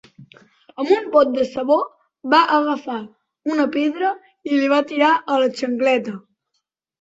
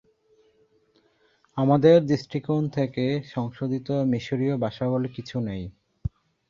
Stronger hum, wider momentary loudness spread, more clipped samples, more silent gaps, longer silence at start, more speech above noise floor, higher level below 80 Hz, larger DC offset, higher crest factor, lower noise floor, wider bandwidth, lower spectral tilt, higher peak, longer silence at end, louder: neither; second, 14 LU vs 18 LU; neither; neither; second, 0.2 s vs 1.55 s; first, 56 dB vs 41 dB; second, -66 dBFS vs -52 dBFS; neither; about the same, 18 dB vs 20 dB; first, -75 dBFS vs -64 dBFS; first, 8 kHz vs 7.2 kHz; second, -4.5 dB/octave vs -8.5 dB/octave; first, -2 dBFS vs -6 dBFS; first, 0.8 s vs 0.4 s; first, -19 LUFS vs -24 LUFS